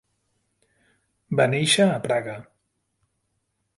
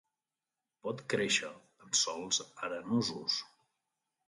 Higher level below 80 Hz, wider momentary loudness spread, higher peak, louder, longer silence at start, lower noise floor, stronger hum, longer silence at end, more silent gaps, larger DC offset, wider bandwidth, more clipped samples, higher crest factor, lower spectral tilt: first, -66 dBFS vs -78 dBFS; first, 15 LU vs 11 LU; first, -6 dBFS vs -16 dBFS; first, -21 LUFS vs -33 LUFS; first, 1.3 s vs 0.85 s; second, -75 dBFS vs under -90 dBFS; neither; first, 1.35 s vs 0.8 s; neither; neither; about the same, 11.5 kHz vs 11.5 kHz; neither; about the same, 20 dB vs 20 dB; first, -4 dB/octave vs -2 dB/octave